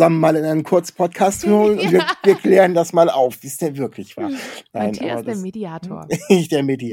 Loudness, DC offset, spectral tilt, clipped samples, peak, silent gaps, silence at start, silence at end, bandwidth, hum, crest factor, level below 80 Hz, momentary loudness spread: -17 LUFS; under 0.1%; -5.5 dB/octave; under 0.1%; 0 dBFS; none; 0 s; 0 s; 17 kHz; none; 16 dB; -58 dBFS; 14 LU